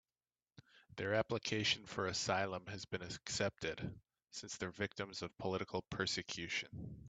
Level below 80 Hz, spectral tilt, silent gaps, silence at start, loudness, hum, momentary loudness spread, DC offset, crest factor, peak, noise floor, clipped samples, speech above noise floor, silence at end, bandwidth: -68 dBFS; -3.5 dB/octave; none; 0.75 s; -41 LUFS; none; 11 LU; under 0.1%; 22 dB; -20 dBFS; under -90 dBFS; under 0.1%; over 49 dB; 0 s; 9 kHz